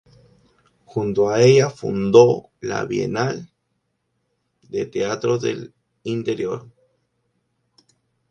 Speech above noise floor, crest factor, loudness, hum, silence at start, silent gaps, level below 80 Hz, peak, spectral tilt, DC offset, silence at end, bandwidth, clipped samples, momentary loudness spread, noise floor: 54 dB; 22 dB; -20 LUFS; none; 0.95 s; none; -58 dBFS; 0 dBFS; -6 dB/octave; under 0.1%; 1.7 s; 9 kHz; under 0.1%; 16 LU; -73 dBFS